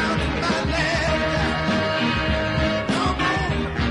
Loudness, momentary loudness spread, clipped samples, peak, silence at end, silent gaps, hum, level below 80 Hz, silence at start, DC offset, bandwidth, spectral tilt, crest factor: -22 LUFS; 2 LU; under 0.1%; -8 dBFS; 0 s; none; none; -32 dBFS; 0 s; under 0.1%; 11 kHz; -5.5 dB/octave; 12 dB